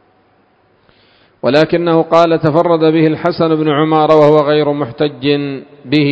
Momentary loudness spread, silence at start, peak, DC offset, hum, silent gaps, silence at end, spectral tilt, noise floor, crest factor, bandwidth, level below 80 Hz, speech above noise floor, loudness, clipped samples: 8 LU; 1.45 s; 0 dBFS; under 0.1%; none; none; 0 s; -8 dB/octave; -53 dBFS; 12 dB; 8 kHz; -52 dBFS; 42 dB; -12 LUFS; 0.4%